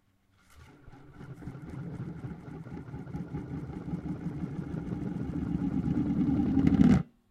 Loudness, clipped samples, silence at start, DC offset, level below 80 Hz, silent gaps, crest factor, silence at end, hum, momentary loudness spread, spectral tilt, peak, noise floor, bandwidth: -31 LUFS; under 0.1%; 0.55 s; under 0.1%; -46 dBFS; none; 24 dB; 0.25 s; none; 19 LU; -9 dB/octave; -8 dBFS; -66 dBFS; 8.8 kHz